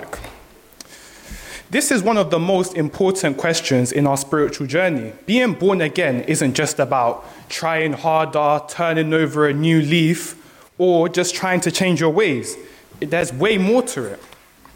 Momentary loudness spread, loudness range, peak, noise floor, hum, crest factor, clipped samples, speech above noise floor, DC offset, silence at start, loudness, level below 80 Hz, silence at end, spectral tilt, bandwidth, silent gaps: 15 LU; 2 LU; -4 dBFS; -45 dBFS; none; 16 dB; under 0.1%; 27 dB; under 0.1%; 0 s; -18 LUFS; -52 dBFS; 0.6 s; -4.5 dB/octave; 17 kHz; none